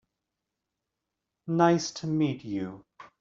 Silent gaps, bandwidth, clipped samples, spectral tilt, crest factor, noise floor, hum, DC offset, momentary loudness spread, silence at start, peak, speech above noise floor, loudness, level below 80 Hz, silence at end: none; 7.8 kHz; under 0.1%; -6 dB/octave; 22 dB; -86 dBFS; none; under 0.1%; 18 LU; 1.45 s; -8 dBFS; 59 dB; -27 LUFS; -70 dBFS; 0.15 s